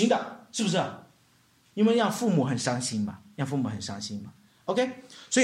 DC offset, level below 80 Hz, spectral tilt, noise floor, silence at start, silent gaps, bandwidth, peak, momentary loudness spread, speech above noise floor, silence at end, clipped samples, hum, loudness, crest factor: under 0.1%; -72 dBFS; -4.5 dB/octave; -63 dBFS; 0 s; none; 15 kHz; -10 dBFS; 15 LU; 36 dB; 0 s; under 0.1%; none; -28 LUFS; 18 dB